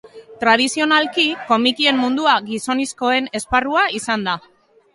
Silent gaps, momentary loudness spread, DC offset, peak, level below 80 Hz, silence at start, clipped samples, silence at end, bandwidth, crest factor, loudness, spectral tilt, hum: none; 6 LU; under 0.1%; 0 dBFS; -50 dBFS; 0.05 s; under 0.1%; 0.55 s; 11.5 kHz; 18 dB; -17 LUFS; -2.5 dB/octave; none